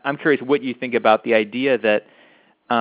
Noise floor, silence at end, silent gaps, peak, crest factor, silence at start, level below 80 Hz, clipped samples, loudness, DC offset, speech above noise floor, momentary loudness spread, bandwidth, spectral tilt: -54 dBFS; 0 s; none; -2 dBFS; 18 dB; 0.05 s; -68 dBFS; under 0.1%; -19 LUFS; under 0.1%; 35 dB; 6 LU; 4 kHz; -9 dB/octave